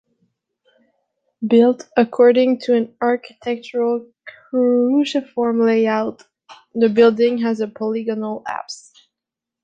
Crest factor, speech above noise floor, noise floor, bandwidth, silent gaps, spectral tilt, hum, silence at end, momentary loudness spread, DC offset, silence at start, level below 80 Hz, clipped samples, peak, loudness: 16 dB; 69 dB; -85 dBFS; 8.4 kHz; none; -6 dB/octave; none; 0.9 s; 14 LU; under 0.1%; 1.4 s; -68 dBFS; under 0.1%; -2 dBFS; -18 LUFS